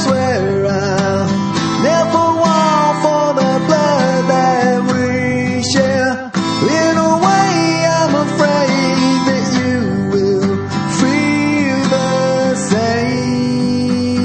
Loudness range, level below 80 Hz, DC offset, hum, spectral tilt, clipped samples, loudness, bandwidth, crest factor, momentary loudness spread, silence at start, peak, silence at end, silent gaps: 2 LU; -48 dBFS; under 0.1%; none; -5 dB/octave; under 0.1%; -14 LUFS; 8.8 kHz; 14 dB; 4 LU; 0 s; 0 dBFS; 0 s; none